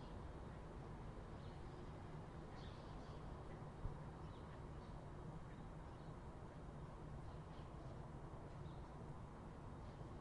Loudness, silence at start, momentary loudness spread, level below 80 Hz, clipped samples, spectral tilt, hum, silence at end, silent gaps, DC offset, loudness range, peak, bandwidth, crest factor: -55 LUFS; 0 s; 1 LU; -60 dBFS; under 0.1%; -7.5 dB/octave; none; 0 s; none; under 0.1%; 1 LU; -34 dBFS; 11 kHz; 18 dB